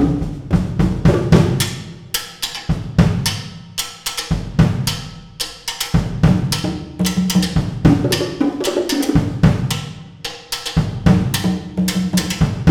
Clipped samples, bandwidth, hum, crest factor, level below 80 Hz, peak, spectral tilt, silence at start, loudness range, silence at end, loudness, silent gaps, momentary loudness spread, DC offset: under 0.1%; 18.5 kHz; none; 16 dB; -30 dBFS; 0 dBFS; -5.5 dB/octave; 0 s; 3 LU; 0 s; -18 LUFS; none; 10 LU; under 0.1%